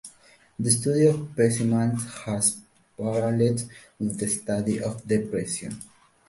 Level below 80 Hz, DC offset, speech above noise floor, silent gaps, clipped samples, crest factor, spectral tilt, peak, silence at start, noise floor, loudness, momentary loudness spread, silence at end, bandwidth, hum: -58 dBFS; under 0.1%; 32 dB; none; under 0.1%; 18 dB; -5.5 dB/octave; -6 dBFS; 0.05 s; -56 dBFS; -25 LUFS; 14 LU; 0.45 s; 12 kHz; none